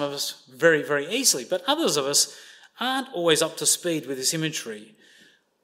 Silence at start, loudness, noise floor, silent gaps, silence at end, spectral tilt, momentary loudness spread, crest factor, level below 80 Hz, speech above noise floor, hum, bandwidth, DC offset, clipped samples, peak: 0 s; -23 LUFS; -57 dBFS; none; 0.8 s; -2 dB/octave; 9 LU; 20 dB; -78 dBFS; 33 dB; none; 16 kHz; under 0.1%; under 0.1%; -4 dBFS